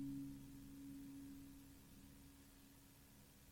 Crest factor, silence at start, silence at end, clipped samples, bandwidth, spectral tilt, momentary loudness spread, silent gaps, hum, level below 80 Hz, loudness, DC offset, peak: 16 dB; 0 s; 0 s; under 0.1%; 17.5 kHz; -5.5 dB/octave; 11 LU; none; none; -70 dBFS; -59 LUFS; under 0.1%; -42 dBFS